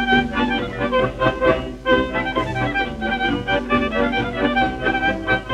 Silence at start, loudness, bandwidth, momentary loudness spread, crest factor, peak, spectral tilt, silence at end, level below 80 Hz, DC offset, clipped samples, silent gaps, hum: 0 s; -20 LUFS; 11 kHz; 4 LU; 16 dB; -4 dBFS; -6 dB/octave; 0 s; -36 dBFS; under 0.1%; under 0.1%; none; none